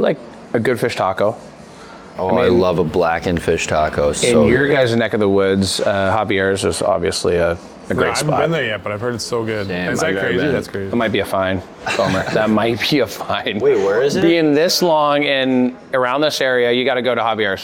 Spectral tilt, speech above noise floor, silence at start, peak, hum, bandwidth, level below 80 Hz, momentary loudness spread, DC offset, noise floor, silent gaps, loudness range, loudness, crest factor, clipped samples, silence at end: -4.5 dB/octave; 21 dB; 0 s; 0 dBFS; none; 18 kHz; -44 dBFS; 7 LU; under 0.1%; -37 dBFS; none; 4 LU; -17 LUFS; 16 dB; under 0.1%; 0 s